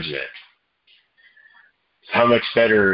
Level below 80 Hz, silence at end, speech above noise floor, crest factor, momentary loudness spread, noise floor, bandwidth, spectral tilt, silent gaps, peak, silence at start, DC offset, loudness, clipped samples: -56 dBFS; 0 s; 41 dB; 20 dB; 13 LU; -59 dBFS; 5.6 kHz; -9.5 dB/octave; none; -2 dBFS; 0 s; under 0.1%; -18 LUFS; under 0.1%